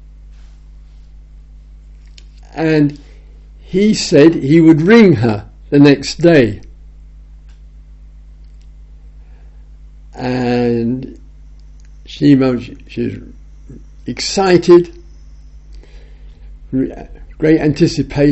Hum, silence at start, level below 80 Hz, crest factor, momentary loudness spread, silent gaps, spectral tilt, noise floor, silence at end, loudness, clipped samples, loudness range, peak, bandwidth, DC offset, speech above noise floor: 50 Hz at -35 dBFS; 2.55 s; -36 dBFS; 14 dB; 18 LU; none; -6.5 dB/octave; -37 dBFS; 0 s; -12 LUFS; 0.1%; 11 LU; 0 dBFS; 8.2 kHz; under 0.1%; 26 dB